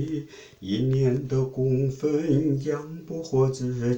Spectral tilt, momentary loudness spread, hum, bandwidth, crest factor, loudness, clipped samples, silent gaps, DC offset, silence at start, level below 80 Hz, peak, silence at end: -8 dB/octave; 11 LU; none; 8.2 kHz; 14 dB; -26 LUFS; under 0.1%; none; under 0.1%; 0 s; -52 dBFS; -10 dBFS; 0 s